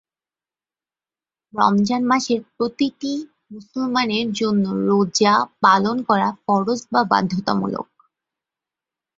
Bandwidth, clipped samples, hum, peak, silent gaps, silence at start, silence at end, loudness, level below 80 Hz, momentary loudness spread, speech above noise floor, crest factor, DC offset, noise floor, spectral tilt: 7.8 kHz; under 0.1%; none; -2 dBFS; none; 1.55 s; 1.35 s; -19 LUFS; -62 dBFS; 11 LU; over 71 dB; 20 dB; under 0.1%; under -90 dBFS; -5 dB/octave